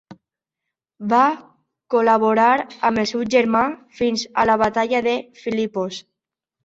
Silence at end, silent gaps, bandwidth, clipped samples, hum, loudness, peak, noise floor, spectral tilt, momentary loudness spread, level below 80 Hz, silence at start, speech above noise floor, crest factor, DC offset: 0.65 s; none; 7.8 kHz; under 0.1%; none; -19 LUFS; -2 dBFS; -83 dBFS; -4.5 dB/octave; 10 LU; -56 dBFS; 0.1 s; 65 dB; 18 dB; under 0.1%